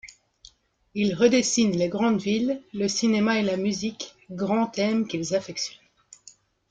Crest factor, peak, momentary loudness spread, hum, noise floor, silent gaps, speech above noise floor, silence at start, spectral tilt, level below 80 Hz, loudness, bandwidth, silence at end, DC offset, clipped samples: 18 dB; -8 dBFS; 11 LU; none; -56 dBFS; none; 32 dB; 0.05 s; -4.5 dB/octave; -62 dBFS; -24 LUFS; 9.4 kHz; 1 s; under 0.1%; under 0.1%